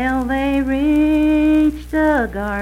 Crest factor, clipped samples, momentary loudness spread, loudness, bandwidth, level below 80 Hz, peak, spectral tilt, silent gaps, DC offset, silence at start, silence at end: 10 dB; under 0.1%; 5 LU; -16 LUFS; 13 kHz; -32 dBFS; -6 dBFS; -7 dB/octave; none; under 0.1%; 0 s; 0 s